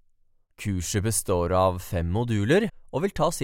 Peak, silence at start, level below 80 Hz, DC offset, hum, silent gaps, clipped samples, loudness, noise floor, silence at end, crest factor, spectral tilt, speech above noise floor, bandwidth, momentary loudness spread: -8 dBFS; 0.6 s; -46 dBFS; under 0.1%; none; none; under 0.1%; -25 LUFS; -62 dBFS; 0 s; 18 dB; -5 dB/octave; 38 dB; 16.5 kHz; 8 LU